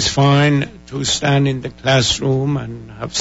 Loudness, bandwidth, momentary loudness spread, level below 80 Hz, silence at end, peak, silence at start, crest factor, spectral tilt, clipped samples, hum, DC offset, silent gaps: -16 LUFS; 8 kHz; 11 LU; -40 dBFS; 0 s; -2 dBFS; 0 s; 14 dB; -4.5 dB/octave; under 0.1%; none; under 0.1%; none